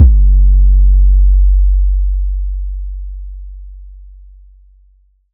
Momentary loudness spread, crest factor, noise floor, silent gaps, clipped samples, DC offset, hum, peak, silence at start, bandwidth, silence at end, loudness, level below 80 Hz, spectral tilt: 20 LU; 10 dB; -50 dBFS; none; under 0.1%; under 0.1%; none; 0 dBFS; 0 s; 0.5 kHz; 1.35 s; -13 LUFS; -10 dBFS; -14 dB/octave